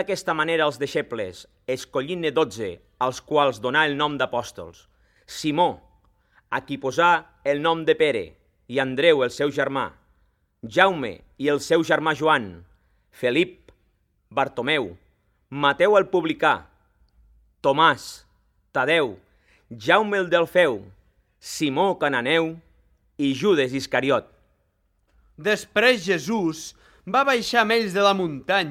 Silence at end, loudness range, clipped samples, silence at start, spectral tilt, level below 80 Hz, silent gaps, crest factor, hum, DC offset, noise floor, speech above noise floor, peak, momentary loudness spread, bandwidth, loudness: 0 s; 3 LU; under 0.1%; 0 s; -4.5 dB/octave; -60 dBFS; none; 22 dB; none; under 0.1%; -68 dBFS; 46 dB; 0 dBFS; 13 LU; 15.5 kHz; -22 LUFS